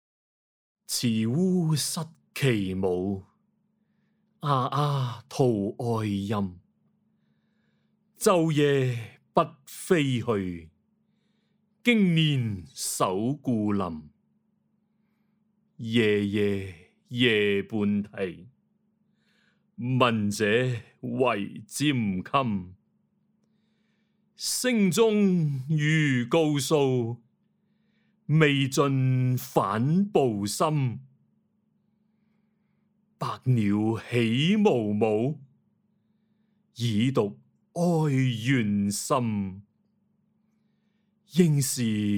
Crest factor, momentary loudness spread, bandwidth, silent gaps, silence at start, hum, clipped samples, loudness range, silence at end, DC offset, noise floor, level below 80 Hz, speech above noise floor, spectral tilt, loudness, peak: 22 dB; 12 LU; over 20 kHz; none; 0.9 s; none; under 0.1%; 5 LU; 0 s; under 0.1%; -71 dBFS; -68 dBFS; 46 dB; -5.5 dB/octave; -26 LUFS; -6 dBFS